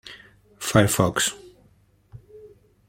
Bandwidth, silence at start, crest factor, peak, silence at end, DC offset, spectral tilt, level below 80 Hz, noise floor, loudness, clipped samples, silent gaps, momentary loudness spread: 16.5 kHz; 0.05 s; 24 dB; -2 dBFS; 0.45 s; under 0.1%; -4 dB/octave; -52 dBFS; -59 dBFS; -21 LUFS; under 0.1%; none; 23 LU